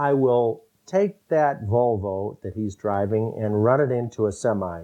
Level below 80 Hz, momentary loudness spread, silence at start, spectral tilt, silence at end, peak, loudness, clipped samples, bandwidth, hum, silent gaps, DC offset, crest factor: -58 dBFS; 10 LU; 0 s; -8 dB/octave; 0 s; -4 dBFS; -23 LUFS; under 0.1%; 10 kHz; none; none; under 0.1%; 18 dB